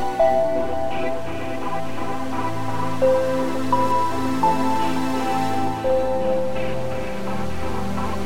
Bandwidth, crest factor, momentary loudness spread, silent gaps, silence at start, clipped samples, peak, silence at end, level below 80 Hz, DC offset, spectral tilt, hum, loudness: 16.5 kHz; 16 dB; 9 LU; none; 0 s; under 0.1%; -6 dBFS; 0 s; -44 dBFS; 6%; -6 dB/octave; none; -23 LUFS